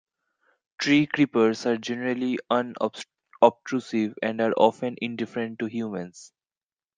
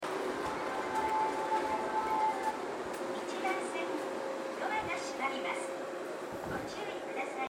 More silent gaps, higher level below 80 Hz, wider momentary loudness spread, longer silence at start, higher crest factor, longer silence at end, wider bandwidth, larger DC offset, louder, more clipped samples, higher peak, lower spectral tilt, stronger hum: neither; second, -74 dBFS vs -66 dBFS; first, 10 LU vs 7 LU; first, 0.8 s vs 0 s; first, 24 dB vs 16 dB; first, 0.7 s vs 0 s; second, 9.4 kHz vs 16 kHz; neither; first, -25 LUFS vs -36 LUFS; neither; first, -2 dBFS vs -20 dBFS; first, -5.5 dB/octave vs -3.5 dB/octave; neither